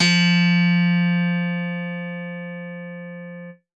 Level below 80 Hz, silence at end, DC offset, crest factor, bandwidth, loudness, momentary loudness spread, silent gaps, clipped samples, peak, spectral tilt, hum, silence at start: -76 dBFS; 0.2 s; under 0.1%; 16 dB; 8.4 kHz; -20 LUFS; 19 LU; none; under 0.1%; -6 dBFS; -5.5 dB/octave; none; 0 s